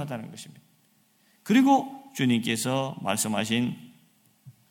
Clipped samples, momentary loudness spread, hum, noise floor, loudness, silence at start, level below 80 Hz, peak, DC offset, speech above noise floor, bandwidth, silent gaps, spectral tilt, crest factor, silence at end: under 0.1%; 22 LU; none; -65 dBFS; -25 LUFS; 0 s; -72 dBFS; -10 dBFS; under 0.1%; 39 dB; 17 kHz; none; -4.5 dB/octave; 18 dB; 0.2 s